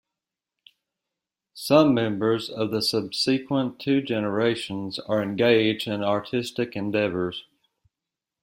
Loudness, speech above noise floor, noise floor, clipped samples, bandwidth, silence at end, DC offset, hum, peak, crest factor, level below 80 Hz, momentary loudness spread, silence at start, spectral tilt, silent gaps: -24 LUFS; 64 dB; -88 dBFS; under 0.1%; 16 kHz; 1 s; under 0.1%; none; -4 dBFS; 22 dB; -64 dBFS; 10 LU; 1.55 s; -5.5 dB/octave; none